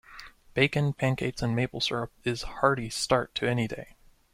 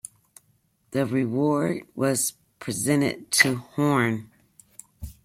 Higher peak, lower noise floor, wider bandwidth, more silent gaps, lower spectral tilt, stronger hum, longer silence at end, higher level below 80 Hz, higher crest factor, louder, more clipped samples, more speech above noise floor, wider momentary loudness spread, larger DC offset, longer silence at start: second, -8 dBFS vs -4 dBFS; second, -49 dBFS vs -66 dBFS; about the same, 15 kHz vs 16.5 kHz; neither; about the same, -5 dB/octave vs -4 dB/octave; neither; first, 0.5 s vs 0.1 s; about the same, -52 dBFS vs -54 dBFS; about the same, 22 dB vs 22 dB; second, -28 LUFS vs -24 LUFS; neither; second, 21 dB vs 42 dB; second, 9 LU vs 15 LU; neither; second, 0.1 s vs 0.9 s